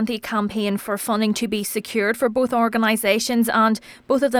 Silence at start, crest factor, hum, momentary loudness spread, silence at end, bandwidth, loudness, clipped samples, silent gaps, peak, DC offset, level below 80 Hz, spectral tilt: 0 s; 16 dB; none; 6 LU; 0 s; 20 kHz; -21 LUFS; under 0.1%; none; -6 dBFS; under 0.1%; -58 dBFS; -4 dB/octave